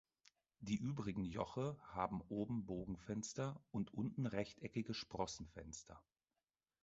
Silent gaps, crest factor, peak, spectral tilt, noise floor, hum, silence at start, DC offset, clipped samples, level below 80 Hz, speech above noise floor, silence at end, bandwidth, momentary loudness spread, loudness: none; 22 dB; -24 dBFS; -6 dB/octave; under -90 dBFS; none; 0.6 s; under 0.1%; under 0.1%; -66 dBFS; over 45 dB; 0.8 s; 8 kHz; 10 LU; -46 LUFS